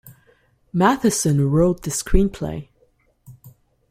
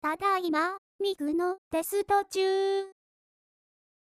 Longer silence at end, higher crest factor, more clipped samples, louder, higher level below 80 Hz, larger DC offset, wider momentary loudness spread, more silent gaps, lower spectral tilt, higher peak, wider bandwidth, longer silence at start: second, 0.4 s vs 1.1 s; first, 20 dB vs 14 dB; neither; first, -20 LUFS vs -29 LUFS; first, -30 dBFS vs -68 dBFS; neither; first, 12 LU vs 6 LU; second, none vs 0.78-0.99 s, 1.58-1.71 s; first, -5.5 dB/octave vs -3 dB/octave; first, -2 dBFS vs -16 dBFS; about the same, 16 kHz vs 15.5 kHz; about the same, 0.1 s vs 0.05 s